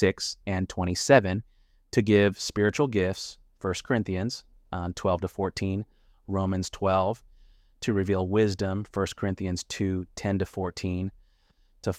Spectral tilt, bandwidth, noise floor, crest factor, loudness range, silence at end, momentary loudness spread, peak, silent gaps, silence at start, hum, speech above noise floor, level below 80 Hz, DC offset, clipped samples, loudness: -5.5 dB/octave; 15 kHz; -63 dBFS; 22 dB; 5 LU; 0 s; 12 LU; -6 dBFS; none; 0 s; none; 37 dB; -52 dBFS; under 0.1%; under 0.1%; -28 LUFS